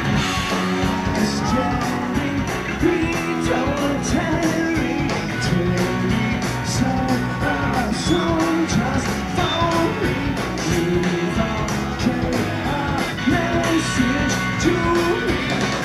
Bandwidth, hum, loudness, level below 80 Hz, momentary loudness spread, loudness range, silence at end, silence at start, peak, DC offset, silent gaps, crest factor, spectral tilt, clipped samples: 15.5 kHz; none; -20 LUFS; -34 dBFS; 3 LU; 1 LU; 0 s; 0 s; -6 dBFS; under 0.1%; none; 14 dB; -5 dB/octave; under 0.1%